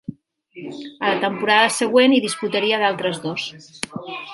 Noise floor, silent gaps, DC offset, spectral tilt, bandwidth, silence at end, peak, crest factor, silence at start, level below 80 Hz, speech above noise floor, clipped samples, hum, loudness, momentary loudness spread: -45 dBFS; none; under 0.1%; -3.5 dB/octave; 11.5 kHz; 0 s; -2 dBFS; 20 dB; 0.1 s; -68 dBFS; 25 dB; under 0.1%; none; -19 LUFS; 18 LU